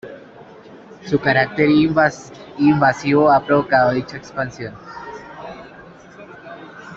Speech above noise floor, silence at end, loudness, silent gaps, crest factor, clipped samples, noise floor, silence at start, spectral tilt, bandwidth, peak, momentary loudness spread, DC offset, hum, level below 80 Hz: 25 dB; 0 s; -17 LUFS; none; 18 dB; under 0.1%; -41 dBFS; 0.05 s; -6.5 dB/octave; 7.6 kHz; -2 dBFS; 23 LU; under 0.1%; none; -52 dBFS